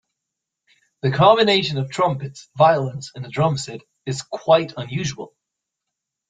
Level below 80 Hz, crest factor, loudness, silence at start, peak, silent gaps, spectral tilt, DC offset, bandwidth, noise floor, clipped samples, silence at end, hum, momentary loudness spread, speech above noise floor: -58 dBFS; 20 dB; -20 LUFS; 1.05 s; -2 dBFS; none; -5 dB/octave; under 0.1%; 9.4 kHz; -82 dBFS; under 0.1%; 1 s; none; 18 LU; 63 dB